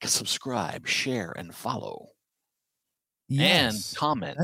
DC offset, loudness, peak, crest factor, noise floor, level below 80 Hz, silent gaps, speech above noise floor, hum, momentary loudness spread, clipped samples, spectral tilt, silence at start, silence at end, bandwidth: under 0.1%; -26 LUFS; -6 dBFS; 22 dB; -86 dBFS; -64 dBFS; none; 59 dB; none; 15 LU; under 0.1%; -3 dB/octave; 0 s; 0 s; 16.5 kHz